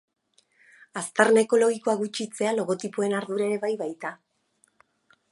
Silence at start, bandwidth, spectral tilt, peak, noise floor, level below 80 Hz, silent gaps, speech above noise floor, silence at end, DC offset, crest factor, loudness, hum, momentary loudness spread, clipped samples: 0.95 s; 11.5 kHz; -4 dB/octave; -2 dBFS; -68 dBFS; -82 dBFS; none; 43 dB; 1.15 s; under 0.1%; 24 dB; -25 LUFS; none; 14 LU; under 0.1%